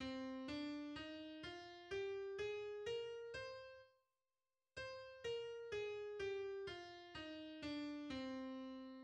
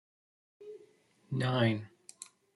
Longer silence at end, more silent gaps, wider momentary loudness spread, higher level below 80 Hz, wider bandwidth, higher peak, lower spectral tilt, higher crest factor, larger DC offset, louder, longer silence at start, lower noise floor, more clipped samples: second, 0 s vs 0.3 s; neither; second, 7 LU vs 23 LU; about the same, -74 dBFS vs -72 dBFS; second, 9.8 kHz vs 12 kHz; second, -36 dBFS vs -14 dBFS; second, -4.5 dB/octave vs -6 dB/octave; second, 14 dB vs 22 dB; neither; second, -49 LUFS vs -32 LUFS; second, 0 s vs 0.6 s; first, under -90 dBFS vs -65 dBFS; neither